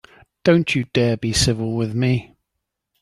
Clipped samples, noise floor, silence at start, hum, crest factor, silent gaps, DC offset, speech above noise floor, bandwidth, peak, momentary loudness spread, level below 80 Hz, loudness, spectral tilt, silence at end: under 0.1%; -79 dBFS; 0.45 s; none; 18 dB; none; under 0.1%; 61 dB; 12.5 kHz; -2 dBFS; 5 LU; -42 dBFS; -19 LUFS; -5 dB/octave; 0.75 s